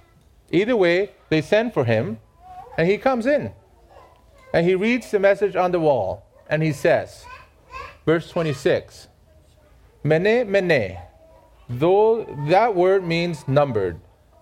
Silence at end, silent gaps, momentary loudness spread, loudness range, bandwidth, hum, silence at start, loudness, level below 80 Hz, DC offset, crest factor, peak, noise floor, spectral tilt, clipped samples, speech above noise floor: 0.4 s; none; 13 LU; 4 LU; 14.5 kHz; none; 0.5 s; -20 LUFS; -52 dBFS; under 0.1%; 18 dB; -4 dBFS; -54 dBFS; -7 dB/octave; under 0.1%; 34 dB